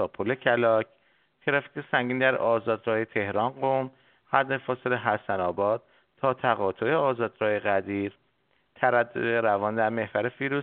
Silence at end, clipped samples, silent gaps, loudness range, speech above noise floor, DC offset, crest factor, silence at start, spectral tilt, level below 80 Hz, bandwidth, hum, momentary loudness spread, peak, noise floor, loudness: 0 s; under 0.1%; none; 2 LU; 44 dB; under 0.1%; 22 dB; 0 s; -4 dB/octave; -70 dBFS; 4.3 kHz; none; 6 LU; -4 dBFS; -70 dBFS; -26 LUFS